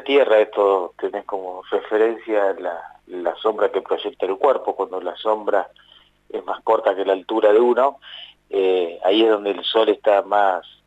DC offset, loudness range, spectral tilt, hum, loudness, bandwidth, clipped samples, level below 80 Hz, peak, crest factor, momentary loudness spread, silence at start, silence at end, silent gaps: under 0.1%; 4 LU; -5 dB/octave; 50 Hz at -65 dBFS; -20 LUFS; 8 kHz; under 0.1%; -68 dBFS; -4 dBFS; 14 dB; 13 LU; 0 s; 0.25 s; none